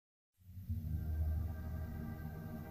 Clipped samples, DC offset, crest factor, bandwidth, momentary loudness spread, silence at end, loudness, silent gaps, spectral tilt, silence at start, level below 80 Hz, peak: under 0.1%; under 0.1%; 14 dB; 15.5 kHz; 8 LU; 0 s; -43 LUFS; none; -9 dB/octave; 0.45 s; -46 dBFS; -28 dBFS